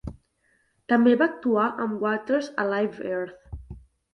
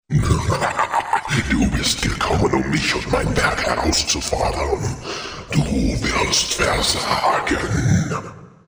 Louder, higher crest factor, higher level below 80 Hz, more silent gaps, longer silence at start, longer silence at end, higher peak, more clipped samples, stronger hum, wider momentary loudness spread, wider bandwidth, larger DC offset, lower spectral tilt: second, -24 LUFS vs -19 LUFS; about the same, 18 dB vs 18 dB; second, -50 dBFS vs -30 dBFS; neither; about the same, 0.05 s vs 0.1 s; first, 0.35 s vs 0.2 s; second, -8 dBFS vs -2 dBFS; neither; neither; first, 22 LU vs 6 LU; second, 6.4 kHz vs over 20 kHz; neither; first, -7 dB/octave vs -4 dB/octave